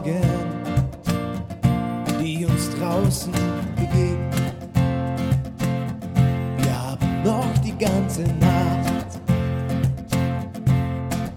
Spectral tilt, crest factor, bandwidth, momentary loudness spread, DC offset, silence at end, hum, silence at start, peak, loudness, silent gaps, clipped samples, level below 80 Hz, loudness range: -6.5 dB/octave; 16 dB; 16.5 kHz; 5 LU; under 0.1%; 0 s; none; 0 s; -6 dBFS; -23 LUFS; none; under 0.1%; -36 dBFS; 2 LU